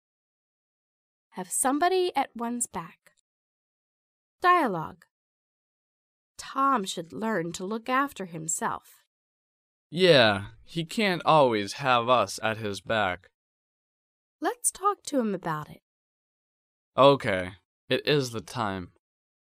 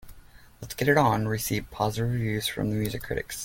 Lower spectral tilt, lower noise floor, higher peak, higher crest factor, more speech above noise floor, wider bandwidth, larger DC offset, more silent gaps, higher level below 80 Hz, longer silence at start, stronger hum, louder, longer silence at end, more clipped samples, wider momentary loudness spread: second, -3.5 dB/octave vs -5 dB/octave; first, under -90 dBFS vs -50 dBFS; about the same, -4 dBFS vs -6 dBFS; about the same, 24 dB vs 20 dB; first, over 64 dB vs 24 dB; about the same, 15.5 kHz vs 17 kHz; neither; first, 3.20-4.39 s, 5.11-6.35 s, 9.07-9.90 s, 13.34-14.39 s, 15.82-16.92 s, 17.65-17.88 s vs none; second, -66 dBFS vs -48 dBFS; first, 1.35 s vs 0 s; neither; about the same, -26 LUFS vs -27 LUFS; first, 0.6 s vs 0 s; neither; first, 15 LU vs 11 LU